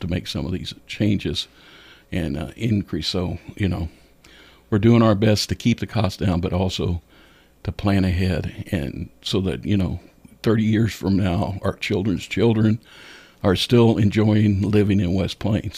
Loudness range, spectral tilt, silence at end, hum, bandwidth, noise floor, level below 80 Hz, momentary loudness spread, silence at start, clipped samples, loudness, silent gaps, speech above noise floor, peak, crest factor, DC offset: 6 LU; -6.5 dB/octave; 0 s; none; 15.5 kHz; -52 dBFS; -42 dBFS; 11 LU; 0 s; under 0.1%; -21 LUFS; none; 31 dB; -4 dBFS; 16 dB; under 0.1%